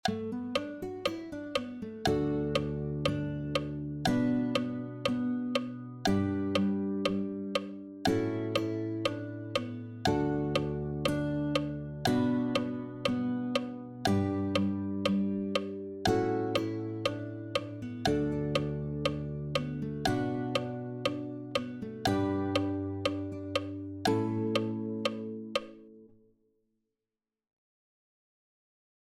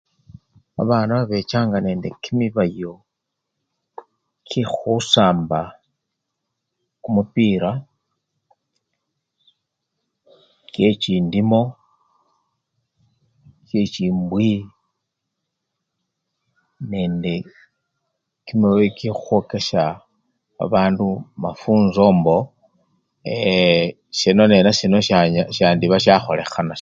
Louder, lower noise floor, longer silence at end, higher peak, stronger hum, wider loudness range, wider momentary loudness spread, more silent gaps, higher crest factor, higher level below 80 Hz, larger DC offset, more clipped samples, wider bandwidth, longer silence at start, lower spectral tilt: second, -33 LUFS vs -18 LUFS; first, under -90 dBFS vs -79 dBFS; first, 3 s vs 0 s; second, -14 dBFS vs 0 dBFS; neither; second, 3 LU vs 10 LU; second, 7 LU vs 13 LU; neither; about the same, 18 dB vs 20 dB; about the same, -54 dBFS vs -52 dBFS; neither; neither; first, 16 kHz vs 7.8 kHz; second, 0.05 s vs 0.8 s; about the same, -6 dB/octave vs -6 dB/octave